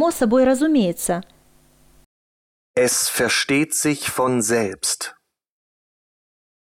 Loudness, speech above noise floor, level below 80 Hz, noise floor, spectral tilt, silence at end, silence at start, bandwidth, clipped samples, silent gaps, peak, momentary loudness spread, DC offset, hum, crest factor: -19 LUFS; 35 dB; -54 dBFS; -55 dBFS; -3 dB/octave; 1.6 s; 0 s; 17 kHz; under 0.1%; 2.06-2.74 s; -6 dBFS; 8 LU; under 0.1%; none; 14 dB